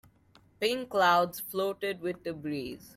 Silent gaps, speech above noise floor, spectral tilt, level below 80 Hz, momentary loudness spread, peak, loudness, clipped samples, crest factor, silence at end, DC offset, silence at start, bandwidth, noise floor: none; 32 dB; -4 dB/octave; -68 dBFS; 12 LU; -12 dBFS; -30 LUFS; under 0.1%; 20 dB; 0.05 s; under 0.1%; 0.6 s; 16.5 kHz; -62 dBFS